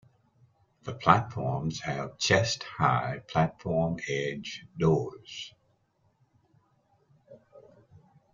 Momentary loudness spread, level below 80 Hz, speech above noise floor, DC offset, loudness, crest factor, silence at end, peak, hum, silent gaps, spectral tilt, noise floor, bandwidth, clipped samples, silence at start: 17 LU; -60 dBFS; 42 dB; under 0.1%; -28 LUFS; 28 dB; 0.75 s; -4 dBFS; none; none; -5 dB/octave; -71 dBFS; 7.6 kHz; under 0.1%; 0.85 s